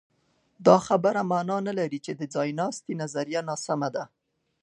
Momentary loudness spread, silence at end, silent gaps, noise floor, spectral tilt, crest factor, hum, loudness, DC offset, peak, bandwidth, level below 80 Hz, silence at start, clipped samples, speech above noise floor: 12 LU; 0.55 s; none; -66 dBFS; -5.5 dB/octave; 24 dB; none; -26 LUFS; under 0.1%; -4 dBFS; 11.5 kHz; -72 dBFS; 0.6 s; under 0.1%; 41 dB